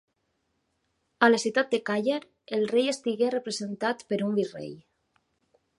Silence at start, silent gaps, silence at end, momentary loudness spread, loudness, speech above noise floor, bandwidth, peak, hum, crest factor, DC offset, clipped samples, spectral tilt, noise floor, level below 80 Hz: 1.2 s; none; 1 s; 11 LU; -27 LUFS; 49 dB; 11.5 kHz; -4 dBFS; none; 24 dB; under 0.1%; under 0.1%; -4 dB/octave; -76 dBFS; -78 dBFS